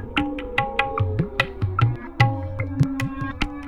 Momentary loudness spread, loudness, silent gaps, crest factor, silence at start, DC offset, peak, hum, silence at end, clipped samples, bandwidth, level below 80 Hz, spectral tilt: 7 LU; -24 LUFS; none; 20 dB; 0 s; 0.4%; -2 dBFS; none; 0 s; under 0.1%; 11.5 kHz; -38 dBFS; -6.5 dB/octave